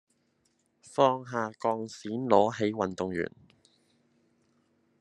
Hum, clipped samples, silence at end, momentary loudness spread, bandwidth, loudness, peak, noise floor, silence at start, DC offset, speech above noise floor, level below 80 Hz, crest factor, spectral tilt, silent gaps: none; under 0.1%; 1.7 s; 11 LU; 10.5 kHz; -29 LUFS; -6 dBFS; -73 dBFS; 0.9 s; under 0.1%; 44 dB; -74 dBFS; 24 dB; -6 dB/octave; none